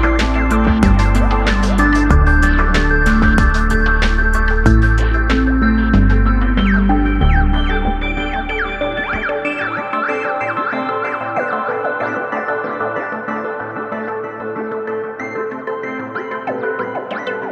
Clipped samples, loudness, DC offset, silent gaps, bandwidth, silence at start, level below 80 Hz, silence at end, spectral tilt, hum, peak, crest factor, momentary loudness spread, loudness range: under 0.1%; -17 LUFS; under 0.1%; none; 10.5 kHz; 0 s; -18 dBFS; 0 s; -6.5 dB/octave; none; 0 dBFS; 14 dB; 10 LU; 9 LU